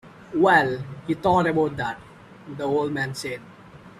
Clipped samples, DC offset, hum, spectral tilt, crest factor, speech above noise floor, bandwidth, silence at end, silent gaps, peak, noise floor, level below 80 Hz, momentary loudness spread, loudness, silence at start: under 0.1%; under 0.1%; none; -6 dB/octave; 20 dB; 23 dB; 13.5 kHz; 0.1 s; none; -4 dBFS; -46 dBFS; -56 dBFS; 15 LU; -23 LUFS; 0.05 s